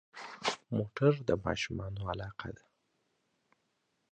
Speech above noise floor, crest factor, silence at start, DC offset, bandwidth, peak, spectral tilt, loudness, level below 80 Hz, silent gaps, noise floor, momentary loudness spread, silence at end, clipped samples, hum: 46 dB; 22 dB; 0.15 s; under 0.1%; 9.4 kHz; -14 dBFS; -6 dB/octave; -34 LUFS; -56 dBFS; none; -79 dBFS; 16 LU; 1.6 s; under 0.1%; none